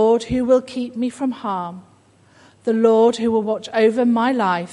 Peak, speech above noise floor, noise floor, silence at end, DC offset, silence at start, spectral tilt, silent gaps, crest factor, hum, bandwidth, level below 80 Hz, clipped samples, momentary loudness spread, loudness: -2 dBFS; 34 dB; -53 dBFS; 0 s; under 0.1%; 0 s; -6 dB/octave; none; 16 dB; none; 11 kHz; -50 dBFS; under 0.1%; 11 LU; -19 LUFS